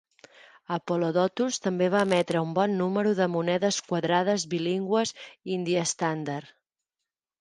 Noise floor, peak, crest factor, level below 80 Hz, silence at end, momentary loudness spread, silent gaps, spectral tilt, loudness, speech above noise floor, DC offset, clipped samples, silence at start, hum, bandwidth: -88 dBFS; -10 dBFS; 18 dB; -72 dBFS; 0.95 s; 8 LU; none; -5 dB/octave; -27 LUFS; 62 dB; under 0.1%; under 0.1%; 0.7 s; none; 11.5 kHz